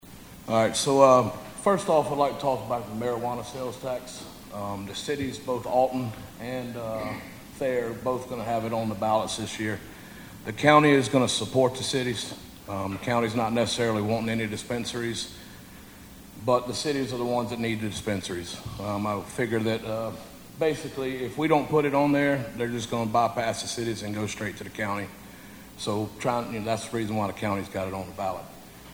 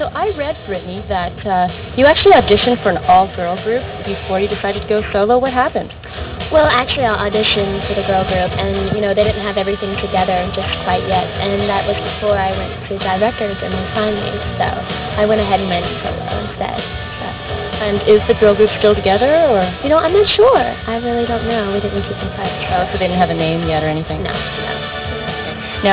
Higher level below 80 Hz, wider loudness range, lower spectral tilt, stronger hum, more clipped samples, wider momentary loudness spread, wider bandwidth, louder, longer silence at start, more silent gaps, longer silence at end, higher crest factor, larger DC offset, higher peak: second, -56 dBFS vs -32 dBFS; about the same, 7 LU vs 5 LU; second, -5 dB/octave vs -9.5 dB/octave; neither; neither; first, 16 LU vs 11 LU; first, over 20 kHz vs 4 kHz; second, -27 LUFS vs -16 LUFS; about the same, 0.05 s vs 0 s; neither; about the same, 0 s vs 0 s; first, 24 dB vs 14 dB; neither; about the same, -2 dBFS vs -2 dBFS